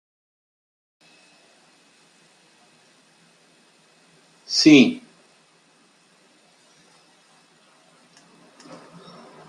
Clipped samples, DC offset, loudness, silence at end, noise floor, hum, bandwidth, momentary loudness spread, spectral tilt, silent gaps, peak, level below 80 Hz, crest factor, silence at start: under 0.1%; under 0.1%; -15 LUFS; 4.5 s; -58 dBFS; none; 10.5 kHz; 32 LU; -4 dB/octave; none; -2 dBFS; -72 dBFS; 24 dB; 4.5 s